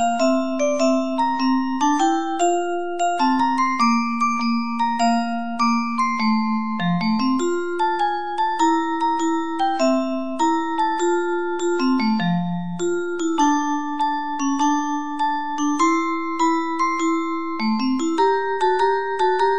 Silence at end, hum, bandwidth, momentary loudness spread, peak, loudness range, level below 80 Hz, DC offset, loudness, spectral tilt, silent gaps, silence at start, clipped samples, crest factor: 0 s; none; 10 kHz; 4 LU; -8 dBFS; 2 LU; -64 dBFS; 2%; -21 LUFS; -5 dB/octave; none; 0 s; under 0.1%; 12 dB